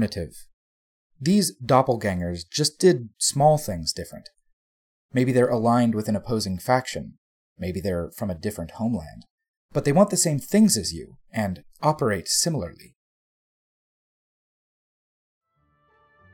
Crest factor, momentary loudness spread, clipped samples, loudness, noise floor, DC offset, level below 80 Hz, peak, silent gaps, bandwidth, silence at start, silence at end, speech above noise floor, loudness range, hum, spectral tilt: 20 dB; 14 LU; under 0.1%; -23 LUFS; -67 dBFS; under 0.1%; -52 dBFS; -4 dBFS; 0.53-1.10 s, 4.53-5.09 s, 7.18-7.56 s, 9.30-9.38 s, 9.48-9.69 s; 17.5 kHz; 0 s; 3.6 s; 44 dB; 6 LU; none; -4.5 dB/octave